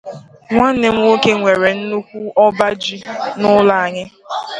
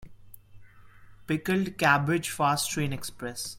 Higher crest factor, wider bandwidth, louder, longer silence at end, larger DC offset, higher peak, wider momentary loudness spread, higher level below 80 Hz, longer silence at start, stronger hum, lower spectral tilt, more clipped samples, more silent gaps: second, 14 dB vs 22 dB; second, 10.5 kHz vs 16.5 kHz; first, -14 LUFS vs -27 LUFS; about the same, 0 s vs 0 s; neither; first, 0 dBFS vs -8 dBFS; about the same, 12 LU vs 12 LU; first, -50 dBFS vs -56 dBFS; about the same, 0.05 s vs 0 s; neither; about the same, -5 dB/octave vs -4.5 dB/octave; neither; neither